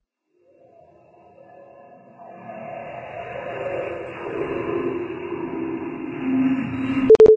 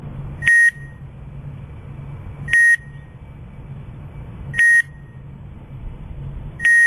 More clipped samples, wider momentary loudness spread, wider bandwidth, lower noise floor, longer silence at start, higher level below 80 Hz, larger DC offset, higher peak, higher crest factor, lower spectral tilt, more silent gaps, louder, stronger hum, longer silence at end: neither; second, 14 LU vs 26 LU; second, 8 kHz vs 13.5 kHz; first, -64 dBFS vs -37 dBFS; first, 1.6 s vs 0 s; second, -52 dBFS vs -40 dBFS; second, under 0.1% vs 0.1%; about the same, -2 dBFS vs 0 dBFS; about the same, 20 dB vs 20 dB; first, -8 dB/octave vs -3 dB/octave; neither; second, -24 LUFS vs -14 LUFS; neither; about the same, 0 s vs 0 s